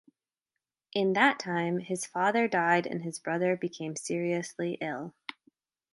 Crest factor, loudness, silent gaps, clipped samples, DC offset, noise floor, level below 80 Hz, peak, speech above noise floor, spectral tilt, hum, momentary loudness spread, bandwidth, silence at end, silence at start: 22 dB; -30 LUFS; none; under 0.1%; under 0.1%; -89 dBFS; -80 dBFS; -8 dBFS; 60 dB; -4.5 dB/octave; none; 11 LU; 11.5 kHz; 0.85 s; 0.95 s